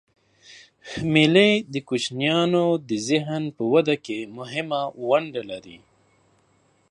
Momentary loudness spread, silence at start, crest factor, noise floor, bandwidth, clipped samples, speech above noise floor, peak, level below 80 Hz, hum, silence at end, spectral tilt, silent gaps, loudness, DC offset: 15 LU; 0.5 s; 22 dB; -63 dBFS; 11 kHz; under 0.1%; 41 dB; -2 dBFS; -62 dBFS; none; 1.15 s; -5 dB/octave; none; -22 LUFS; under 0.1%